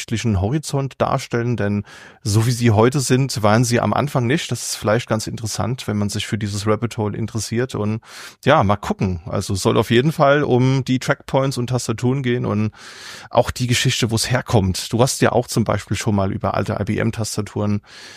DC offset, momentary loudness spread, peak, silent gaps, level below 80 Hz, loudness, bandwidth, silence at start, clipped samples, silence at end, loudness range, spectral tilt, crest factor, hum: under 0.1%; 8 LU; -2 dBFS; none; -46 dBFS; -19 LUFS; 15.5 kHz; 0 s; under 0.1%; 0 s; 3 LU; -5.5 dB/octave; 18 dB; none